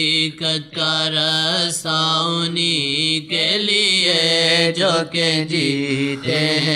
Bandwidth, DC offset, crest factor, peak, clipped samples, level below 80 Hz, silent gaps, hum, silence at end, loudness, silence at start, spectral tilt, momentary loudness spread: 14.5 kHz; under 0.1%; 16 dB; -4 dBFS; under 0.1%; -62 dBFS; none; none; 0 s; -17 LUFS; 0 s; -3 dB/octave; 6 LU